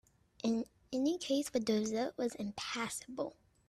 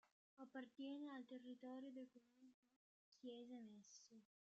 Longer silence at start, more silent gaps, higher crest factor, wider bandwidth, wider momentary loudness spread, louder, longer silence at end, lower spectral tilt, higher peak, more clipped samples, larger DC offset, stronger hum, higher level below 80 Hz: first, 0.45 s vs 0.05 s; second, none vs 0.12-0.37 s, 2.54-2.63 s, 2.76-3.12 s; about the same, 16 dB vs 16 dB; first, 14 kHz vs 8 kHz; second, 7 LU vs 10 LU; first, -37 LUFS vs -58 LUFS; about the same, 0.35 s vs 0.3 s; about the same, -4 dB/octave vs -3 dB/octave; first, -22 dBFS vs -44 dBFS; neither; neither; neither; first, -72 dBFS vs under -90 dBFS